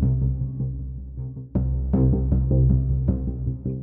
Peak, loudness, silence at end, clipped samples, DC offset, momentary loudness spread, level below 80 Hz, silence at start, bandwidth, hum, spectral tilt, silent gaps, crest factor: -8 dBFS; -24 LUFS; 0 s; under 0.1%; under 0.1%; 14 LU; -26 dBFS; 0 s; 1.6 kHz; none; -15.5 dB/octave; none; 14 dB